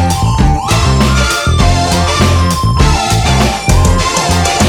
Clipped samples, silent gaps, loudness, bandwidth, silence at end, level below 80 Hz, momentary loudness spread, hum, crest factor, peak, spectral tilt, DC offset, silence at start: under 0.1%; none; -11 LUFS; 17.5 kHz; 0 s; -16 dBFS; 1 LU; none; 10 dB; 0 dBFS; -4.5 dB/octave; under 0.1%; 0 s